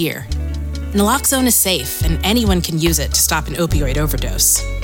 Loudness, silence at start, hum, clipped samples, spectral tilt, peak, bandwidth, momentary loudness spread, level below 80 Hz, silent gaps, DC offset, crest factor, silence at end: -16 LUFS; 0 s; none; under 0.1%; -3.5 dB/octave; -4 dBFS; over 20 kHz; 10 LU; -24 dBFS; none; under 0.1%; 12 dB; 0 s